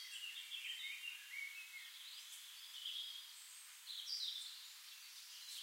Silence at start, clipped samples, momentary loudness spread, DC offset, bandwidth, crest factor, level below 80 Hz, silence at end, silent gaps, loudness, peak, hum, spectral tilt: 0 s; under 0.1%; 10 LU; under 0.1%; 16 kHz; 18 dB; under -90 dBFS; 0 s; none; -48 LUFS; -32 dBFS; none; 8.5 dB/octave